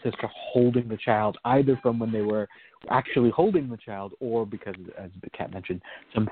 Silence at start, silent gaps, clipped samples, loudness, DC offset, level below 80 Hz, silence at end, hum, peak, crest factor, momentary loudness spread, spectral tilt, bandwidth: 0.05 s; none; under 0.1%; -26 LUFS; under 0.1%; -58 dBFS; 0 s; none; -6 dBFS; 20 dB; 16 LU; -6.5 dB/octave; 4.5 kHz